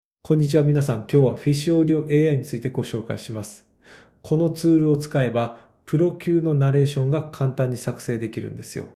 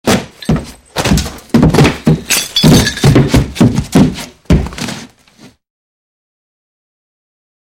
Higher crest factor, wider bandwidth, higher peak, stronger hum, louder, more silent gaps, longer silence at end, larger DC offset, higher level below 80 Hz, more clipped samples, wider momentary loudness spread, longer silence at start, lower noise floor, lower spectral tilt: about the same, 16 dB vs 12 dB; second, 14 kHz vs 17 kHz; second, -6 dBFS vs 0 dBFS; neither; second, -21 LUFS vs -11 LUFS; neither; second, 0.05 s vs 2.6 s; neither; second, -56 dBFS vs -24 dBFS; second, under 0.1% vs 0.5%; about the same, 12 LU vs 13 LU; first, 0.3 s vs 0.05 s; first, -51 dBFS vs -42 dBFS; first, -7.5 dB/octave vs -5 dB/octave